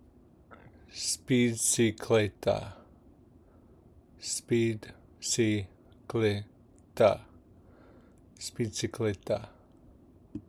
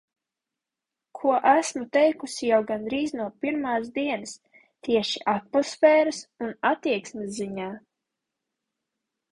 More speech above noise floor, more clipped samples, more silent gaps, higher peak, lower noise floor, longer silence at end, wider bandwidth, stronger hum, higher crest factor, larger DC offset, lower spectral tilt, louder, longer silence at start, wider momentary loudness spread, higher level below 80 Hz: second, 29 dB vs 63 dB; neither; neither; second, -10 dBFS vs -6 dBFS; second, -58 dBFS vs -88 dBFS; second, 0.1 s vs 1.55 s; first, 16 kHz vs 11.5 kHz; neither; about the same, 22 dB vs 20 dB; neither; about the same, -4.5 dB/octave vs -4 dB/octave; second, -30 LUFS vs -25 LUFS; second, 0.5 s vs 1.15 s; first, 20 LU vs 14 LU; first, -62 dBFS vs -68 dBFS